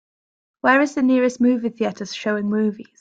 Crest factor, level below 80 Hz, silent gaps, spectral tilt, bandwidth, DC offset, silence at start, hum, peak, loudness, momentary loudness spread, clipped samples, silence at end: 16 dB; -66 dBFS; none; -5.5 dB/octave; 7.8 kHz; under 0.1%; 0.65 s; none; -4 dBFS; -20 LUFS; 8 LU; under 0.1%; 0.2 s